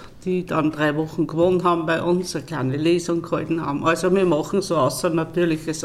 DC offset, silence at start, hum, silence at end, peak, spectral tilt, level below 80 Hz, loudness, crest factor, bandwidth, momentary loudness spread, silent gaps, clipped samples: under 0.1%; 0 s; none; 0 s; -6 dBFS; -6 dB/octave; -50 dBFS; -21 LUFS; 14 dB; 14.5 kHz; 6 LU; none; under 0.1%